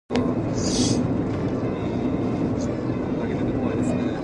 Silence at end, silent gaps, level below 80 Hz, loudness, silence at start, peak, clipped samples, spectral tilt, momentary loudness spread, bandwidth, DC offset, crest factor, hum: 0 s; none; -40 dBFS; -24 LUFS; 0.1 s; -4 dBFS; under 0.1%; -6 dB/octave; 4 LU; 11.5 kHz; under 0.1%; 20 dB; none